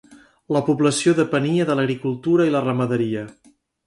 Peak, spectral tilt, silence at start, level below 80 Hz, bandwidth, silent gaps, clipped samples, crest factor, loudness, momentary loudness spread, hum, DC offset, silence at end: -6 dBFS; -6 dB/octave; 0.1 s; -64 dBFS; 11.5 kHz; none; under 0.1%; 16 dB; -20 LUFS; 7 LU; none; under 0.1%; 0.55 s